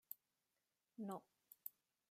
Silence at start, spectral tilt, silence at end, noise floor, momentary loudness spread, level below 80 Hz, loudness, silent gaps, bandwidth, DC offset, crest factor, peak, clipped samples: 0.1 s; -6.5 dB/octave; 0.4 s; under -90 dBFS; 12 LU; under -90 dBFS; -55 LUFS; none; 15 kHz; under 0.1%; 26 dB; -32 dBFS; under 0.1%